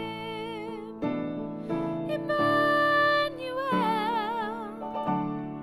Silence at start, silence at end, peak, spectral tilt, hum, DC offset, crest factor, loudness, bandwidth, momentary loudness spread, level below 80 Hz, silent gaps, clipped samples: 0 s; 0 s; -12 dBFS; -6 dB/octave; none; under 0.1%; 16 dB; -28 LUFS; 15.5 kHz; 13 LU; -60 dBFS; none; under 0.1%